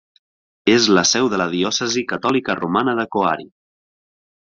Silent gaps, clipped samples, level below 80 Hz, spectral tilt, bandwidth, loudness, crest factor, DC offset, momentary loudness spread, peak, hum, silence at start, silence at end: none; under 0.1%; -58 dBFS; -3 dB/octave; 7.6 kHz; -18 LUFS; 18 dB; under 0.1%; 7 LU; -2 dBFS; none; 0.65 s; 0.95 s